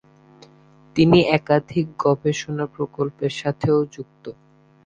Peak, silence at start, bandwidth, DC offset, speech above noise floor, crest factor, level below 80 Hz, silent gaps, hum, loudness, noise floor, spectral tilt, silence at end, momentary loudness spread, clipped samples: -2 dBFS; 0.95 s; 9 kHz; under 0.1%; 31 dB; 20 dB; -54 dBFS; none; none; -21 LUFS; -51 dBFS; -6.5 dB/octave; 0.55 s; 17 LU; under 0.1%